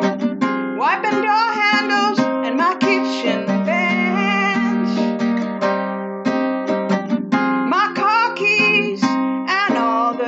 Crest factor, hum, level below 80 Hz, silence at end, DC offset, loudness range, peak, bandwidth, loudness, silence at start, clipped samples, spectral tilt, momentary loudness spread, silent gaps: 14 dB; none; -84 dBFS; 0 s; under 0.1%; 3 LU; -4 dBFS; 8 kHz; -18 LUFS; 0 s; under 0.1%; -5.5 dB/octave; 5 LU; none